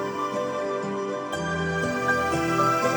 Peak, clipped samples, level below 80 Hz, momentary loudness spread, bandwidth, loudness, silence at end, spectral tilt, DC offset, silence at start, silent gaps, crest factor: -10 dBFS; under 0.1%; -52 dBFS; 7 LU; over 20 kHz; -26 LUFS; 0 s; -5 dB/octave; under 0.1%; 0 s; none; 16 dB